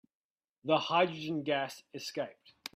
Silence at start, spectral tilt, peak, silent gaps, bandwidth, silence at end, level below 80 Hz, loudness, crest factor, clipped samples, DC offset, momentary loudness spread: 0.65 s; -4.5 dB/octave; -14 dBFS; none; 16 kHz; 0.45 s; -80 dBFS; -33 LUFS; 20 dB; under 0.1%; under 0.1%; 14 LU